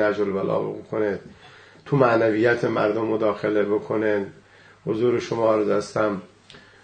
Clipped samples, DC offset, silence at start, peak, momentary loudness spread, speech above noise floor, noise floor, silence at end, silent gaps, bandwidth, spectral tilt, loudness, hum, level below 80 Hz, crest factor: under 0.1%; under 0.1%; 0 s; -4 dBFS; 9 LU; 27 dB; -49 dBFS; 0.25 s; none; 9.2 kHz; -7 dB/octave; -22 LUFS; none; -62 dBFS; 20 dB